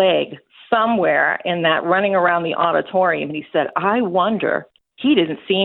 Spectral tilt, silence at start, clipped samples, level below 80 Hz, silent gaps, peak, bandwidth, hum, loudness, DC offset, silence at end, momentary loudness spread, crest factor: -9 dB/octave; 0 s; under 0.1%; -64 dBFS; none; -2 dBFS; 4.4 kHz; none; -18 LUFS; under 0.1%; 0 s; 6 LU; 16 dB